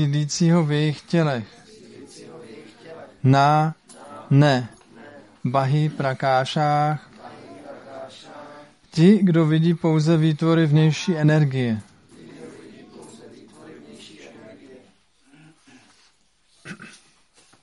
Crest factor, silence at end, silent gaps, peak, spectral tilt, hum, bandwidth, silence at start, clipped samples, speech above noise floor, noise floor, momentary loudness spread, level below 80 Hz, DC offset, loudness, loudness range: 18 dB; 0.75 s; none; -4 dBFS; -7 dB/octave; none; 11 kHz; 0 s; under 0.1%; 44 dB; -63 dBFS; 25 LU; -64 dBFS; under 0.1%; -20 LUFS; 6 LU